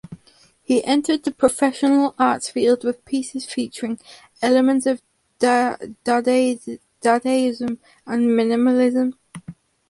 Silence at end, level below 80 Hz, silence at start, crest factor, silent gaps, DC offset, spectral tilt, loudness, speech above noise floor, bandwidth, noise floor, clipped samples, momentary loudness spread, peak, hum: 0.35 s; -62 dBFS; 0.1 s; 18 dB; none; under 0.1%; -4 dB/octave; -20 LUFS; 36 dB; 11.5 kHz; -55 dBFS; under 0.1%; 11 LU; -2 dBFS; none